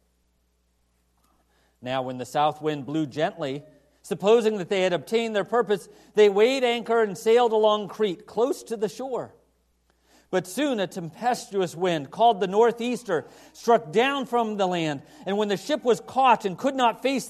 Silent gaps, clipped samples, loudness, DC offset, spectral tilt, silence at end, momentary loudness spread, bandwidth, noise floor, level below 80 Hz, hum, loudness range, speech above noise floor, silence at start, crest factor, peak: none; under 0.1%; -24 LUFS; under 0.1%; -5 dB/octave; 0 s; 10 LU; 13 kHz; -69 dBFS; -70 dBFS; none; 7 LU; 45 dB; 1.8 s; 18 dB; -6 dBFS